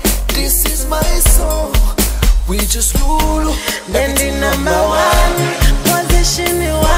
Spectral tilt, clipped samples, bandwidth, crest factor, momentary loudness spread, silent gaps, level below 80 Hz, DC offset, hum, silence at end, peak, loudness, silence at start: -3.5 dB/octave; under 0.1%; 16.5 kHz; 12 dB; 4 LU; none; -14 dBFS; under 0.1%; none; 0 s; 0 dBFS; -14 LUFS; 0 s